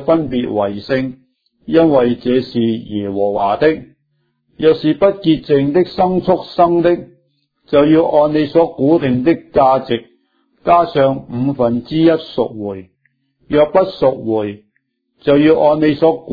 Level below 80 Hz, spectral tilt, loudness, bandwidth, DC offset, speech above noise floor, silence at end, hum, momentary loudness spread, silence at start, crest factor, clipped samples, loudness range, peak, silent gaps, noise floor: -46 dBFS; -9.5 dB/octave; -14 LUFS; 5 kHz; under 0.1%; 53 dB; 0 s; none; 9 LU; 0 s; 14 dB; under 0.1%; 3 LU; 0 dBFS; none; -66 dBFS